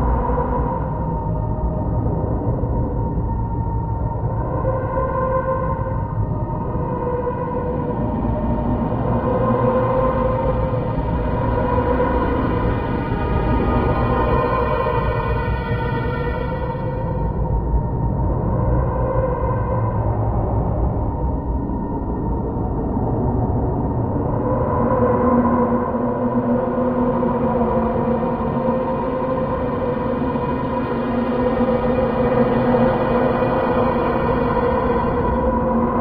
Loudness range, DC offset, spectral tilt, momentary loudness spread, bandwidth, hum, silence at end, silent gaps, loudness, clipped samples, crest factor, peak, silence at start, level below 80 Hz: 4 LU; under 0.1%; -11.5 dB/octave; 5 LU; 4.9 kHz; none; 0 s; none; -20 LUFS; under 0.1%; 16 dB; -4 dBFS; 0 s; -26 dBFS